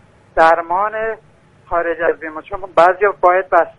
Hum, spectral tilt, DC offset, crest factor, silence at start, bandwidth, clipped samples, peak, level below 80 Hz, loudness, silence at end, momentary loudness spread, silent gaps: none; -5.5 dB/octave; under 0.1%; 16 dB; 0.35 s; 9.4 kHz; under 0.1%; 0 dBFS; -44 dBFS; -15 LUFS; 0.05 s; 13 LU; none